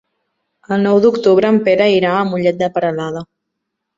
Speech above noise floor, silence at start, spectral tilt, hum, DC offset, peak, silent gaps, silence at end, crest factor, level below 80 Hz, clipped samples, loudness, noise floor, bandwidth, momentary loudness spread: 62 dB; 0.7 s; -7 dB/octave; none; under 0.1%; 0 dBFS; none; 0.75 s; 14 dB; -58 dBFS; under 0.1%; -14 LUFS; -75 dBFS; 7.6 kHz; 10 LU